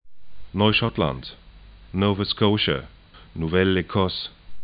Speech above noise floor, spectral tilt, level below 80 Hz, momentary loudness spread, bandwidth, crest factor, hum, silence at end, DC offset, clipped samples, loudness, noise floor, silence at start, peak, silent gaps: 24 dB; -10.5 dB/octave; -46 dBFS; 14 LU; 5.2 kHz; 20 dB; none; 0 s; under 0.1%; under 0.1%; -23 LUFS; -46 dBFS; 0.05 s; -4 dBFS; none